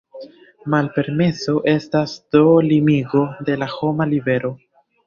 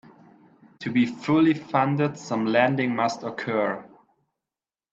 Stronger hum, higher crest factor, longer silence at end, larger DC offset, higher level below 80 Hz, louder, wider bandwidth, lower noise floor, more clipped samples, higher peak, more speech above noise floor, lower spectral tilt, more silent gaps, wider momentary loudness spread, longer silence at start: neither; about the same, 16 dB vs 20 dB; second, 0.5 s vs 1.05 s; neither; first, -56 dBFS vs -68 dBFS; first, -18 LUFS vs -24 LUFS; about the same, 7.2 kHz vs 7.8 kHz; second, -39 dBFS vs under -90 dBFS; neither; first, -2 dBFS vs -6 dBFS; second, 22 dB vs over 67 dB; about the same, -7.5 dB/octave vs -6.5 dB/octave; neither; about the same, 9 LU vs 8 LU; second, 0.15 s vs 0.8 s